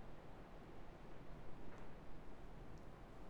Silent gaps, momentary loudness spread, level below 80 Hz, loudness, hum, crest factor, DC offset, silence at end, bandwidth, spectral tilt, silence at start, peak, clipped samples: none; 1 LU; -60 dBFS; -59 LUFS; none; 12 dB; under 0.1%; 0 s; 14.5 kHz; -7 dB/octave; 0 s; -38 dBFS; under 0.1%